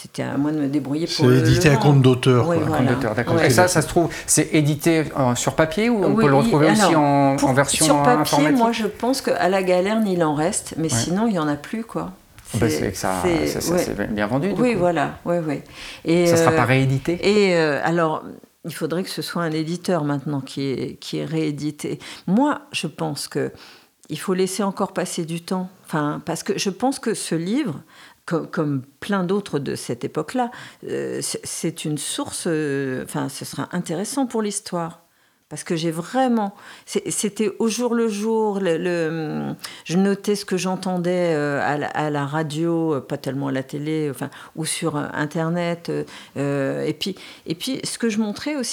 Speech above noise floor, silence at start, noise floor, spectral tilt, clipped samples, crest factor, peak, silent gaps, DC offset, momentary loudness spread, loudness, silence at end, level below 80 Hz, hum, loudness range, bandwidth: 38 dB; 0 s; -59 dBFS; -5 dB/octave; under 0.1%; 20 dB; 0 dBFS; none; under 0.1%; 12 LU; -21 LUFS; 0 s; -50 dBFS; none; 8 LU; 19.5 kHz